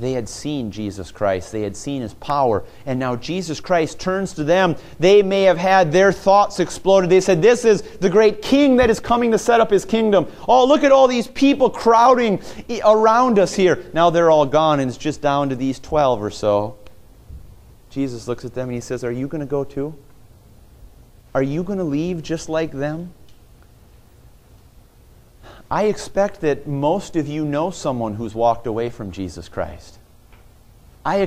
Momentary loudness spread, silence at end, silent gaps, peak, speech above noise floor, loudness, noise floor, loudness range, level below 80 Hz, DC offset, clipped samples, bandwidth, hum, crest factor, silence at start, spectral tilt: 14 LU; 0 s; none; 0 dBFS; 31 dB; -18 LUFS; -48 dBFS; 12 LU; -44 dBFS; under 0.1%; under 0.1%; 15 kHz; none; 18 dB; 0 s; -5.5 dB/octave